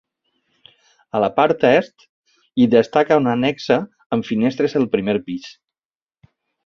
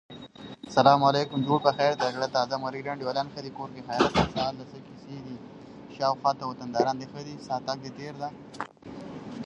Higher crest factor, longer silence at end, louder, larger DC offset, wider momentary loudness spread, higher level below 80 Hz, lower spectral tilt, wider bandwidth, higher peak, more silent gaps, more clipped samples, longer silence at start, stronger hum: second, 18 dB vs 26 dB; first, 1.15 s vs 0 s; first, -18 LUFS vs -27 LUFS; neither; second, 12 LU vs 20 LU; about the same, -58 dBFS vs -54 dBFS; first, -7 dB/octave vs -5.5 dB/octave; second, 6.8 kHz vs 10.5 kHz; about the same, -2 dBFS vs -2 dBFS; first, 2.09-2.24 s, 4.06-4.10 s vs none; neither; first, 1.15 s vs 0.1 s; neither